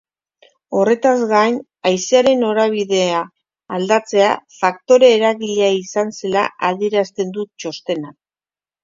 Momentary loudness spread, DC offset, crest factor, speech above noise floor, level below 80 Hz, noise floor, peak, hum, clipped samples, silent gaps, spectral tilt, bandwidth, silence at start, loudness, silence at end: 11 LU; under 0.1%; 16 dB; over 74 dB; -66 dBFS; under -90 dBFS; 0 dBFS; none; under 0.1%; none; -4 dB/octave; 7.6 kHz; 0.7 s; -16 LUFS; 0.7 s